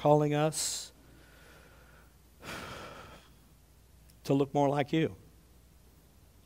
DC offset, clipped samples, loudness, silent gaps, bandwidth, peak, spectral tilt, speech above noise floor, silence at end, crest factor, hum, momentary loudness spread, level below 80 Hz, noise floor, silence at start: under 0.1%; under 0.1%; -31 LUFS; none; 16 kHz; -10 dBFS; -5 dB/octave; 32 dB; 1.3 s; 24 dB; none; 22 LU; -62 dBFS; -60 dBFS; 0 s